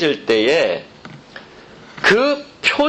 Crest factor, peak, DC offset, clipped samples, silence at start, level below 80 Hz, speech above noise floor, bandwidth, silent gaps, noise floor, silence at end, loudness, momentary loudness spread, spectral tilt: 16 dB; -2 dBFS; under 0.1%; under 0.1%; 0 s; -54 dBFS; 25 dB; 10.5 kHz; none; -41 dBFS; 0 s; -16 LUFS; 24 LU; -4 dB/octave